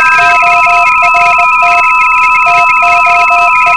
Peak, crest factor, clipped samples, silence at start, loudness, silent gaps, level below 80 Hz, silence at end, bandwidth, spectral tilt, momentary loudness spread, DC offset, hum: 0 dBFS; 6 dB; 2%; 0 s; -5 LUFS; none; -40 dBFS; 0 s; 11 kHz; -1.5 dB/octave; 1 LU; 2%; none